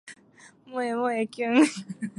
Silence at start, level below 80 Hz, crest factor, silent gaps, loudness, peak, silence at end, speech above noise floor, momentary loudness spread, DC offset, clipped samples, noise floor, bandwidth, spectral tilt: 0.05 s; -80 dBFS; 18 dB; none; -25 LUFS; -8 dBFS; 0.1 s; 29 dB; 13 LU; under 0.1%; under 0.1%; -55 dBFS; 11.5 kHz; -4.5 dB/octave